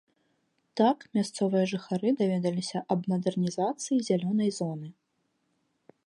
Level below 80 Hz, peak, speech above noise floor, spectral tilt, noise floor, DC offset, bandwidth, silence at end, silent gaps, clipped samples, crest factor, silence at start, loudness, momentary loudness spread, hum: -76 dBFS; -10 dBFS; 48 dB; -6 dB/octave; -76 dBFS; under 0.1%; 11.5 kHz; 1.15 s; none; under 0.1%; 18 dB; 0.75 s; -29 LUFS; 8 LU; none